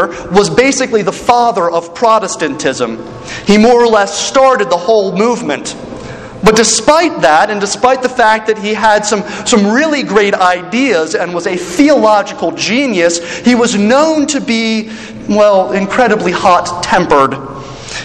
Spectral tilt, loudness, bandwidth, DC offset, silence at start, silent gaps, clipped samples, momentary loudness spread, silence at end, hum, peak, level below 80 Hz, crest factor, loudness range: -3.5 dB/octave; -10 LUFS; 12.5 kHz; under 0.1%; 0 s; none; 0.7%; 10 LU; 0 s; none; 0 dBFS; -42 dBFS; 10 dB; 1 LU